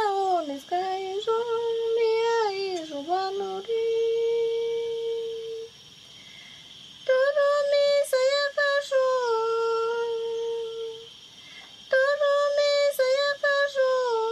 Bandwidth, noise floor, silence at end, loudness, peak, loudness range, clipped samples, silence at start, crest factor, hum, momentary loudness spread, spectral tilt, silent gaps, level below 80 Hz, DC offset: 13.5 kHz; -49 dBFS; 0 s; -25 LUFS; -12 dBFS; 5 LU; under 0.1%; 0 s; 14 dB; none; 21 LU; -2 dB/octave; none; -74 dBFS; under 0.1%